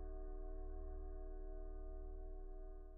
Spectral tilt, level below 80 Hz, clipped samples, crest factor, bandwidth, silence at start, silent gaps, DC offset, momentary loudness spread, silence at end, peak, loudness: -8 dB/octave; -48 dBFS; under 0.1%; 8 dB; 1.9 kHz; 0 s; none; under 0.1%; 3 LU; 0 s; -40 dBFS; -55 LUFS